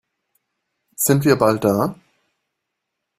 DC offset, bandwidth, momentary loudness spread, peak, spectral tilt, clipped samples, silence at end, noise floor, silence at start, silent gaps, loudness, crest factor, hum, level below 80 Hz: under 0.1%; 16 kHz; 6 LU; 0 dBFS; -5.5 dB/octave; under 0.1%; 1.25 s; -79 dBFS; 1 s; none; -18 LUFS; 20 dB; none; -56 dBFS